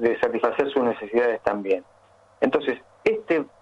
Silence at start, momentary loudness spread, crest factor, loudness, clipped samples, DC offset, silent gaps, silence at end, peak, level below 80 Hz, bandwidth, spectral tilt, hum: 0 s; 4 LU; 16 dB; -24 LUFS; under 0.1%; under 0.1%; none; 0.15 s; -8 dBFS; -62 dBFS; 7.8 kHz; -6.5 dB/octave; none